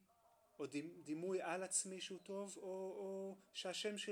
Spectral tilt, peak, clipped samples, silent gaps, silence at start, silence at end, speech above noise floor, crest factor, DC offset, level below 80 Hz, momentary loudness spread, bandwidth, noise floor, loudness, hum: -2.5 dB/octave; -26 dBFS; under 0.1%; none; 0.6 s; 0 s; 28 dB; 22 dB; under 0.1%; under -90 dBFS; 9 LU; 19.5 kHz; -74 dBFS; -46 LUFS; none